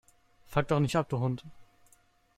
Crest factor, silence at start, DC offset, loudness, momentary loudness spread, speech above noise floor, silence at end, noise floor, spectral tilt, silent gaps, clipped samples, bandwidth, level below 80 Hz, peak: 22 dB; 0.5 s; under 0.1%; -31 LUFS; 6 LU; 36 dB; 0.75 s; -65 dBFS; -7 dB/octave; none; under 0.1%; 14.5 kHz; -56 dBFS; -12 dBFS